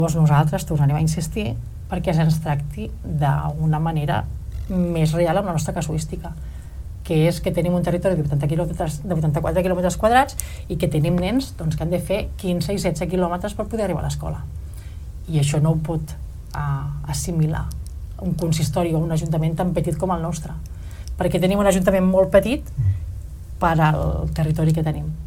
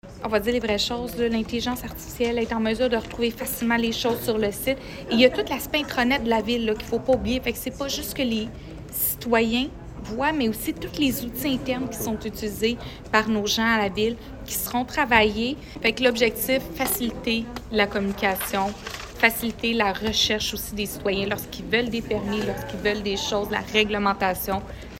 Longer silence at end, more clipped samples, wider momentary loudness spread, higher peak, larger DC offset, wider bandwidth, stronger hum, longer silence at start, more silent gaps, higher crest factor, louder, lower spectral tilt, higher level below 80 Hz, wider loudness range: about the same, 0 s vs 0 s; neither; first, 15 LU vs 8 LU; about the same, -2 dBFS vs -2 dBFS; neither; about the same, 16 kHz vs 16.5 kHz; neither; about the same, 0 s vs 0.05 s; neither; about the same, 20 dB vs 22 dB; first, -21 LUFS vs -24 LUFS; first, -6.5 dB/octave vs -3.5 dB/octave; first, -32 dBFS vs -44 dBFS; about the same, 4 LU vs 3 LU